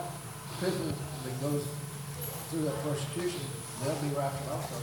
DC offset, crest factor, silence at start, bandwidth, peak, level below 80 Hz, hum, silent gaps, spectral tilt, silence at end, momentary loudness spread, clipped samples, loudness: under 0.1%; 16 dB; 0 s; 18 kHz; -18 dBFS; -62 dBFS; none; none; -5 dB/octave; 0 s; 7 LU; under 0.1%; -35 LUFS